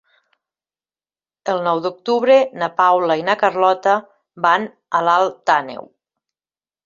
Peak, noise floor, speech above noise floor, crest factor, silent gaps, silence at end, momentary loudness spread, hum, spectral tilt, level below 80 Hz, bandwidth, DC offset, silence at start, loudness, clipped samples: -2 dBFS; under -90 dBFS; over 73 dB; 18 dB; none; 1.05 s; 7 LU; none; -4.5 dB/octave; -70 dBFS; 7.4 kHz; under 0.1%; 1.45 s; -17 LUFS; under 0.1%